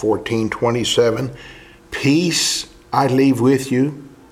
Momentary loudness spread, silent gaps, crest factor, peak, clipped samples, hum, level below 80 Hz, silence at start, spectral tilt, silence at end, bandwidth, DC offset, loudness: 11 LU; none; 16 dB; -2 dBFS; under 0.1%; none; -50 dBFS; 0 s; -4.5 dB/octave; 0.25 s; 15.5 kHz; under 0.1%; -17 LUFS